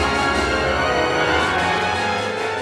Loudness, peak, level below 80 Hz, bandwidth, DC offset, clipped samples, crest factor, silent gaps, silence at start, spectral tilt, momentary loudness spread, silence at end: -19 LUFS; -6 dBFS; -36 dBFS; 14.5 kHz; under 0.1%; under 0.1%; 14 dB; none; 0 s; -4 dB/octave; 4 LU; 0 s